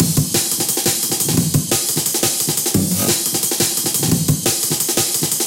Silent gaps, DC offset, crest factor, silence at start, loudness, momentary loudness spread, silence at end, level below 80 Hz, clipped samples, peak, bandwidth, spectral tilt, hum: none; under 0.1%; 18 dB; 0 s; -16 LUFS; 1 LU; 0 s; -46 dBFS; under 0.1%; 0 dBFS; 17.5 kHz; -3 dB/octave; none